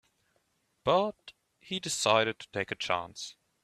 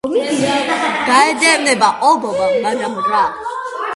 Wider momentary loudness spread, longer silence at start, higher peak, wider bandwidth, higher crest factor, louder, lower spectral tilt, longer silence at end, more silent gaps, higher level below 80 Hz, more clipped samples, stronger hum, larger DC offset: first, 14 LU vs 8 LU; first, 0.85 s vs 0.05 s; second, -8 dBFS vs 0 dBFS; first, 15 kHz vs 11.5 kHz; first, 24 dB vs 16 dB; second, -30 LUFS vs -14 LUFS; about the same, -3 dB/octave vs -2.5 dB/octave; first, 0.3 s vs 0 s; neither; second, -70 dBFS vs -56 dBFS; neither; neither; neither